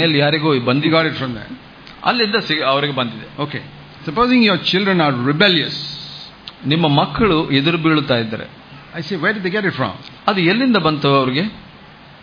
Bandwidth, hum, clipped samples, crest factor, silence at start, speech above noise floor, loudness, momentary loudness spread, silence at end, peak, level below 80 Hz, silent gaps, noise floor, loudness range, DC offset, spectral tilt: 5.2 kHz; none; under 0.1%; 16 dB; 0 s; 25 dB; -16 LUFS; 16 LU; 0.2 s; 0 dBFS; -48 dBFS; none; -41 dBFS; 3 LU; under 0.1%; -7 dB/octave